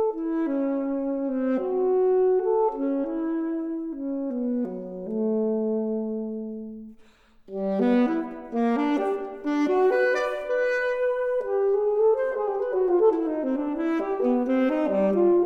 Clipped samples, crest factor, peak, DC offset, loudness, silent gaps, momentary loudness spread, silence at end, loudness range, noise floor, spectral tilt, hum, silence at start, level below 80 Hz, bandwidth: under 0.1%; 14 dB; -10 dBFS; under 0.1%; -25 LUFS; none; 10 LU; 0 s; 5 LU; -54 dBFS; -7.5 dB/octave; none; 0 s; -58 dBFS; 6.8 kHz